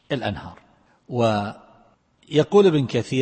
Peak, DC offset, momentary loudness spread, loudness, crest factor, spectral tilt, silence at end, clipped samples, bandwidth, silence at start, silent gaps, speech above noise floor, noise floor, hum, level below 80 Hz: -4 dBFS; under 0.1%; 17 LU; -21 LUFS; 18 dB; -6.5 dB/octave; 0 s; under 0.1%; 8.8 kHz; 0.1 s; none; 38 dB; -58 dBFS; none; -56 dBFS